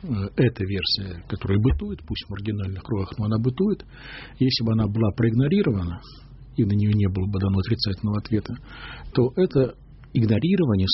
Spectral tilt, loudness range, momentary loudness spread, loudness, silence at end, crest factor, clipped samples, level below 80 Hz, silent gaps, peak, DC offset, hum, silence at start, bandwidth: -6.5 dB/octave; 3 LU; 12 LU; -24 LUFS; 0 s; 14 dB; under 0.1%; -40 dBFS; none; -8 dBFS; under 0.1%; none; 0 s; 6 kHz